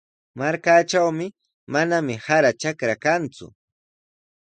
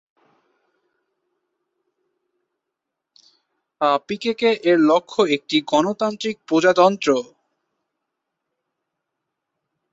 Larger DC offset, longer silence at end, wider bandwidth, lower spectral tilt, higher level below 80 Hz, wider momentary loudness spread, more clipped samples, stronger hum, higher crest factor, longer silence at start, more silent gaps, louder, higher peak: neither; second, 0.95 s vs 2.7 s; first, 9.2 kHz vs 8 kHz; about the same, -4.5 dB/octave vs -4.5 dB/octave; about the same, -66 dBFS vs -68 dBFS; about the same, 10 LU vs 8 LU; neither; neither; about the same, 18 dB vs 20 dB; second, 0.35 s vs 3.8 s; first, 1.54-1.67 s vs none; about the same, -21 LUFS vs -19 LUFS; about the same, -4 dBFS vs -2 dBFS